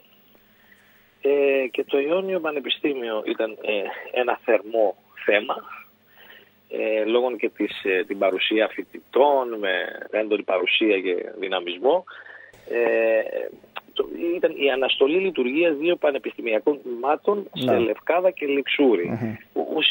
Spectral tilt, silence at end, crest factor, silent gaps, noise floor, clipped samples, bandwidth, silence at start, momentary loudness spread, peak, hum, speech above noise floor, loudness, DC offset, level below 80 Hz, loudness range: -6.5 dB/octave; 0 s; 20 dB; none; -56 dBFS; under 0.1%; 16.5 kHz; 1.25 s; 10 LU; -4 dBFS; none; 33 dB; -23 LUFS; under 0.1%; -70 dBFS; 3 LU